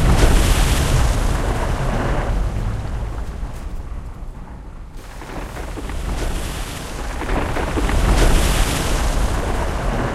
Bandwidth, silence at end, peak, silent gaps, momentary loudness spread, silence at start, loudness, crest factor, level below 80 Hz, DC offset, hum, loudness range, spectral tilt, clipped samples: 14 kHz; 0 s; 0 dBFS; none; 17 LU; 0 s; -21 LUFS; 18 dB; -20 dBFS; under 0.1%; none; 10 LU; -5 dB/octave; under 0.1%